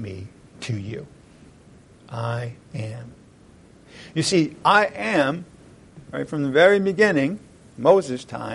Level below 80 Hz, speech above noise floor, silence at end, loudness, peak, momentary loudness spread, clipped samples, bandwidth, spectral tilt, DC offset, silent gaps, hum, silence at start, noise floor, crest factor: -58 dBFS; 29 dB; 0 s; -21 LUFS; -4 dBFS; 20 LU; under 0.1%; 11.5 kHz; -5 dB/octave; under 0.1%; none; none; 0 s; -50 dBFS; 20 dB